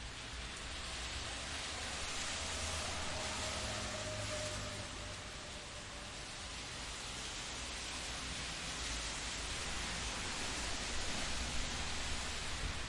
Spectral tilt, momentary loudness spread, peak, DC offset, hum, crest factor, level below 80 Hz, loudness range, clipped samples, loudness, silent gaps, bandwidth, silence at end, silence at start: -2 dB/octave; 6 LU; -26 dBFS; under 0.1%; none; 16 dB; -50 dBFS; 4 LU; under 0.1%; -41 LUFS; none; 11.5 kHz; 0 s; 0 s